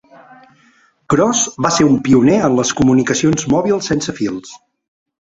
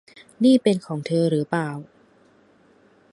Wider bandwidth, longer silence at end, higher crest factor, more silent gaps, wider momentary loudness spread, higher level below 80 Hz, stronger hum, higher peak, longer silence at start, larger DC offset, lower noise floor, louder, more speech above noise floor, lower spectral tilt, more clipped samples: second, 8 kHz vs 11.5 kHz; second, 0.8 s vs 1.3 s; about the same, 14 dB vs 18 dB; neither; second, 8 LU vs 11 LU; first, -44 dBFS vs -70 dBFS; neither; first, -2 dBFS vs -6 dBFS; first, 1.1 s vs 0.4 s; neither; second, -53 dBFS vs -57 dBFS; first, -14 LUFS vs -21 LUFS; about the same, 39 dB vs 36 dB; second, -4.5 dB/octave vs -7 dB/octave; neither